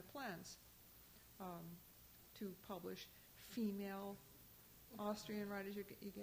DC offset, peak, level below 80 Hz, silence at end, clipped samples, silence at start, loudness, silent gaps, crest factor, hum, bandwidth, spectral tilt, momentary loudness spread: under 0.1%; -34 dBFS; -76 dBFS; 0 s; under 0.1%; 0 s; -51 LUFS; none; 18 dB; none; over 20 kHz; -5 dB/octave; 16 LU